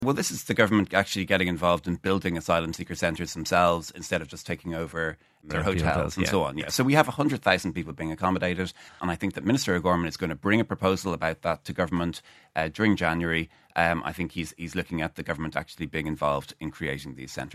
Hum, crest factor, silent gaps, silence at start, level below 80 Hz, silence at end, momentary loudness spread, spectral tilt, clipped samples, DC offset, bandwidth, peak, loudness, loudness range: none; 24 dB; none; 0 s; -48 dBFS; 0 s; 10 LU; -5 dB/octave; under 0.1%; under 0.1%; 14 kHz; -2 dBFS; -27 LUFS; 4 LU